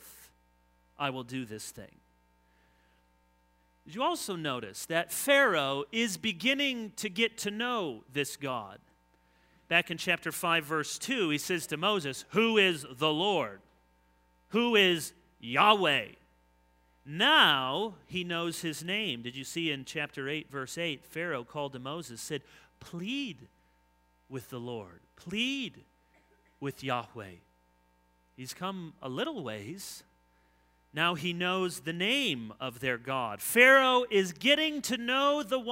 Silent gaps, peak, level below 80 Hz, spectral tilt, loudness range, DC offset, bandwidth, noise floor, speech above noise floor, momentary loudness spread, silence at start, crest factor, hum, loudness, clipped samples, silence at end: none; -6 dBFS; -70 dBFS; -3 dB/octave; 14 LU; under 0.1%; 16 kHz; -69 dBFS; 38 dB; 17 LU; 0.05 s; 26 dB; none; -29 LUFS; under 0.1%; 0 s